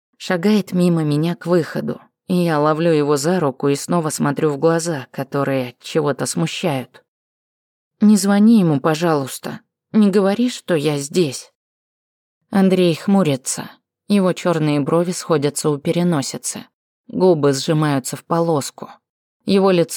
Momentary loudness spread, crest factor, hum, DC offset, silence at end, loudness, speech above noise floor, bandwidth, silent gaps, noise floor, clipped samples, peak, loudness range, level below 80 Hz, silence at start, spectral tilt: 12 LU; 14 dB; none; under 0.1%; 0 s; -18 LUFS; over 73 dB; 18.5 kHz; 7.08-7.91 s, 11.55-12.41 s, 16.73-17.04 s, 19.09-19.40 s; under -90 dBFS; under 0.1%; -4 dBFS; 3 LU; -72 dBFS; 0.2 s; -6 dB/octave